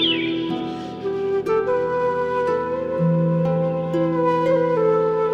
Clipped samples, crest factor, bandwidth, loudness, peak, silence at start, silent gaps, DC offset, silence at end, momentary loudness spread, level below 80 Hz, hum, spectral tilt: under 0.1%; 14 dB; 7.4 kHz; -21 LUFS; -8 dBFS; 0 s; none; under 0.1%; 0 s; 7 LU; -54 dBFS; none; -7.5 dB/octave